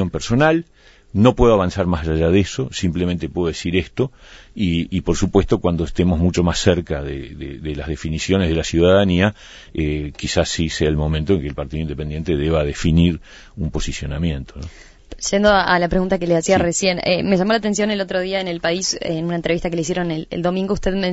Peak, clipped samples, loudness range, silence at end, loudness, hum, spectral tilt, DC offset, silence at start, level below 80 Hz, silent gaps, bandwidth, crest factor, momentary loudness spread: 0 dBFS; under 0.1%; 4 LU; 0 s; -19 LUFS; none; -5.5 dB/octave; under 0.1%; 0 s; -32 dBFS; none; 8 kHz; 18 dB; 11 LU